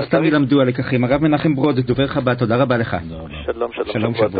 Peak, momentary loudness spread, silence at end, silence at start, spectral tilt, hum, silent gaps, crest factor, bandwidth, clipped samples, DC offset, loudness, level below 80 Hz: -2 dBFS; 9 LU; 0 s; 0 s; -12.5 dB/octave; none; none; 14 dB; 5 kHz; under 0.1%; under 0.1%; -18 LUFS; -42 dBFS